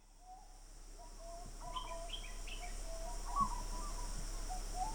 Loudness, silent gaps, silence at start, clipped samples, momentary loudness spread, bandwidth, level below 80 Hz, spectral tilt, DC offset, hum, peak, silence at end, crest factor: -45 LUFS; none; 0 s; under 0.1%; 19 LU; over 20 kHz; -46 dBFS; -3 dB/octave; under 0.1%; none; -24 dBFS; 0 s; 20 dB